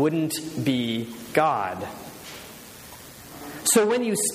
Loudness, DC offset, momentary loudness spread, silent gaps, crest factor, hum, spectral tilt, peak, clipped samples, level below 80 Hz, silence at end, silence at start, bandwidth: -24 LUFS; under 0.1%; 22 LU; none; 20 dB; none; -3.5 dB/octave; -6 dBFS; under 0.1%; -62 dBFS; 0 s; 0 s; 15.5 kHz